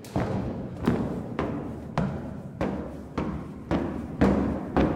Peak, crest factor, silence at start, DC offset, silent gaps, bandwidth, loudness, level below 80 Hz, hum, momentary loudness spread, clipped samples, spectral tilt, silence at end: -8 dBFS; 20 dB; 0 s; under 0.1%; none; 15.5 kHz; -30 LUFS; -42 dBFS; none; 11 LU; under 0.1%; -8 dB/octave; 0 s